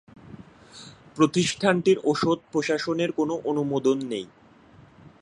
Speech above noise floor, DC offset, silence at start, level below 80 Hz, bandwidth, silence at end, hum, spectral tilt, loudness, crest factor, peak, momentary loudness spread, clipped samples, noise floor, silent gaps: 29 dB; under 0.1%; 0.3 s; -62 dBFS; 11.5 kHz; 0.15 s; none; -5 dB/octave; -24 LUFS; 20 dB; -6 dBFS; 21 LU; under 0.1%; -52 dBFS; none